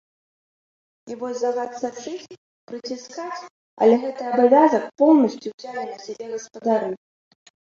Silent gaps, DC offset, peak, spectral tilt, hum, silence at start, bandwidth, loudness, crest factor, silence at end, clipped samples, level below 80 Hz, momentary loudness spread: 2.38-2.67 s, 3.50-3.77 s, 5.54-5.58 s; under 0.1%; -4 dBFS; -5.5 dB/octave; none; 1.05 s; 7.6 kHz; -21 LUFS; 18 dB; 0.8 s; under 0.1%; -72 dBFS; 19 LU